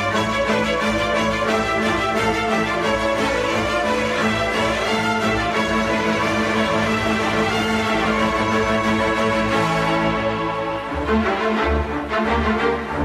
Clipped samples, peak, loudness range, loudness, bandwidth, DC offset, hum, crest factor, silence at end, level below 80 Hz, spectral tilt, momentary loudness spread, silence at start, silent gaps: under 0.1%; -6 dBFS; 1 LU; -19 LUFS; 14 kHz; under 0.1%; none; 14 dB; 0 s; -36 dBFS; -5 dB/octave; 2 LU; 0 s; none